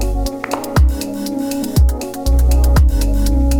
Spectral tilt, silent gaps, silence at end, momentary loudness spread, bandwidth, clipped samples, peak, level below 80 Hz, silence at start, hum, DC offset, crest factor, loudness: -6 dB/octave; none; 0 s; 8 LU; 17.5 kHz; under 0.1%; 0 dBFS; -14 dBFS; 0 s; none; under 0.1%; 12 dB; -16 LUFS